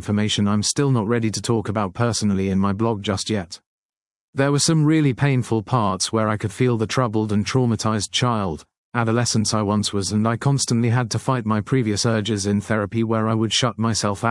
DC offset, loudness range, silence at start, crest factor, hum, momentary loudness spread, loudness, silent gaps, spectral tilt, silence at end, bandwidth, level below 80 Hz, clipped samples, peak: under 0.1%; 2 LU; 0 s; 18 dB; none; 4 LU; -21 LUFS; 3.66-4.33 s, 8.77-8.92 s; -5 dB/octave; 0 s; 12 kHz; -56 dBFS; under 0.1%; -2 dBFS